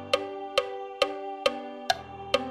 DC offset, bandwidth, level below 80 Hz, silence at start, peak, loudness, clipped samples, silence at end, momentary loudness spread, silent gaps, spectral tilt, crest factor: under 0.1%; 16 kHz; -60 dBFS; 0 s; -8 dBFS; -30 LUFS; under 0.1%; 0 s; 1 LU; none; -2.5 dB/octave; 22 dB